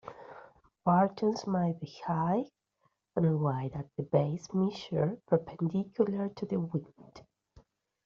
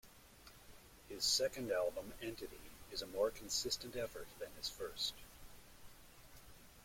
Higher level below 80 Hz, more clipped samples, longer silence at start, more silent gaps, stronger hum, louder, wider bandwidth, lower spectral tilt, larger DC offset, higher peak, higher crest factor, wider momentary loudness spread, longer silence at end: about the same, -68 dBFS vs -64 dBFS; neither; about the same, 0.05 s vs 0.05 s; neither; neither; first, -32 LUFS vs -41 LUFS; second, 7.2 kHz vs 16.5 kHz; first, -8 dB/octave vs -1.5 dB/octave; neither; first, -12 dBFS vs -24 dBFS; about the same, 20 dB vs 22 dB; second, 10 LU vs 24 LU; first, 0.85 s vs 0 s